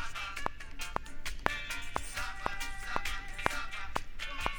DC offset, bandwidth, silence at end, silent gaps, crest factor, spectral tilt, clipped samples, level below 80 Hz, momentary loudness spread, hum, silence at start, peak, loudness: under 0.1%; over 20 kHz; 0 s; none; 30 dB; -2.5 dB/octave; under 0.1%; -42 dBFS; 5 LU; none; 0 s; -6 dBFS; -38 LUFS